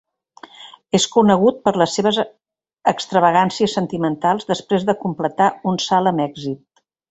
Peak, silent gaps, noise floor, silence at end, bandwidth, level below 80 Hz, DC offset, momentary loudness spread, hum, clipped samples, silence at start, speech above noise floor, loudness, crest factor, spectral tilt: -2 dBFS; none; -45 dBFS; 0.55 s; 8.2 kHz; -60 dBFS; under 0.1%; 10 LU; none; under 0.1%; 0.6 s; 28 dB; -18 LUFS; 18 dB; -5 dB/octave